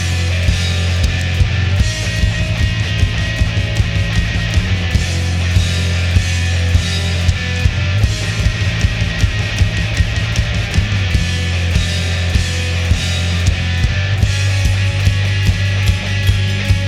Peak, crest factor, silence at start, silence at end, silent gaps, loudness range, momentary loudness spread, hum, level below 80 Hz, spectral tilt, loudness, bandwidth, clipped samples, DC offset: 0 dBFS; 14 dB; 0 s; 0 s; none; 1 LU; 2 LU; none; -22 dBFS; -4.5 dB/octave; -16 LUFS; 13 kHz; under 0.1%; under 0.1%